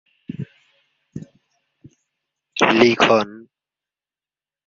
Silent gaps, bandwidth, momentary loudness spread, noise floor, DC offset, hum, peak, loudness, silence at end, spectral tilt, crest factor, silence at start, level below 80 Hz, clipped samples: none; 7.4 kHz; 24 LU; under -90 dBFS; under 0.1%; none; -2 dBFS; -16 LUFS; 1.3 s; -4.5 dB/octave; 22 dB; 0.3 s; -58 dBFS; under 0.1%